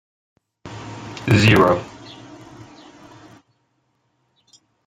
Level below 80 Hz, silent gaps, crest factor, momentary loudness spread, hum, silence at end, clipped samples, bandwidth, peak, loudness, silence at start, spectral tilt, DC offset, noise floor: -50 dBFS; none; 22 dB; 28 LU; none; 3 s; under 0.1%; 15.5 kHz; -2 dBFS; -16 LUFS; 0.65 s; -6 dB/octave; under 0.1%; -68 dBFS